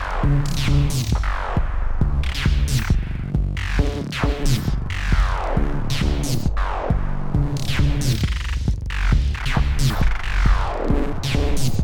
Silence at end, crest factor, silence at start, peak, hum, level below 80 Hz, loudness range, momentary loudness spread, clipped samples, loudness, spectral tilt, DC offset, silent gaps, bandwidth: 0 s; 16 dB; 0 s; -4 dBFS; none; -22 dBFS; 1 LU; 4 LU; under 0.1%; -22 LUFS; -5.5 dB/octave; under 0.1%; none; 18 kHz